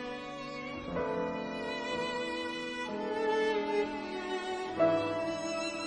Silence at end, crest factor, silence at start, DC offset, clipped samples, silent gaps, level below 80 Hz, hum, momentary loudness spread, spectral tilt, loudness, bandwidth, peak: 0 s; 18 dB; 0 s; under 0.1%; under 0.1%; none; -62 dBFS; none; 9 LU; -4.5 dB/octave; -34 LUFS; 10 kHz; -16 dBFS